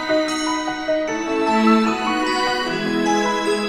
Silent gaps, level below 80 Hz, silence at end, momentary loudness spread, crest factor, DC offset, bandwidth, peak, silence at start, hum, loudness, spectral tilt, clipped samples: none; -50 dBFS; 0 s; 6 LU; 16 dB; under 0.1%; 14.5 kHz; -4 dBFS; 0 s; none; -19 LUFS; -4 dB/octave; under 0.1%